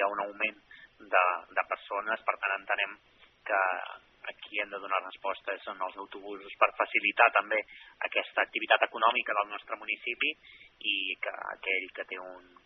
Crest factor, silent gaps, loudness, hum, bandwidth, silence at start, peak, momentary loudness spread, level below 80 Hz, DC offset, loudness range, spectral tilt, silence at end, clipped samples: 26 dB; none; -30 LUFS; none; 5.6 kHz; 0 s; -6 dBFS; 16 LU; -78 dBFS; under 0.1%; 6 LU; 2.5 dB/octave; 0.25 s; under 0.1%